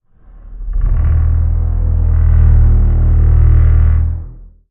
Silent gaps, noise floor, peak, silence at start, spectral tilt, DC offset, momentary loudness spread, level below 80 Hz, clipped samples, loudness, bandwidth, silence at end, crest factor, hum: none; -37 dBFS; 0 dBFS; 0.45 s; -11.5 dB/octave; under 0.1%; 11 LU; -12 dBFS; under 0.1%; -13 LUFS; 2.4 kHz; 0.25 s; 10 dB; none